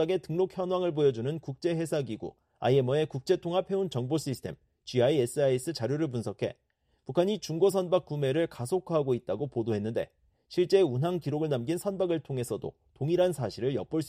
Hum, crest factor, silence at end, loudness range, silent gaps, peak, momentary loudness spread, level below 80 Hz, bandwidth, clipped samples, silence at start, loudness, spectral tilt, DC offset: none; 18 dB; 0 s; 1 LU; none; -12 dBFS; 10 LU; -64 dBFS; 14.5 kHz; under 0.1%; 0 s; -30 LUFS; -6.5 dB/octave; under 0.1%